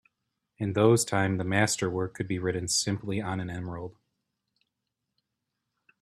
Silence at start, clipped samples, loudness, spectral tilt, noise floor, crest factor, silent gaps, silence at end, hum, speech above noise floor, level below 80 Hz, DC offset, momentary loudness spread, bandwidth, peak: 0.6 s; under 0.1%; -28 LUFS; -4.5 dB/octave; -84 dBFS; 22 dB; none; 2.1 s; none; 56 dB; -62 dBFS; under 0.1%; 13 LU; 13.5 kHz; -8 dBFS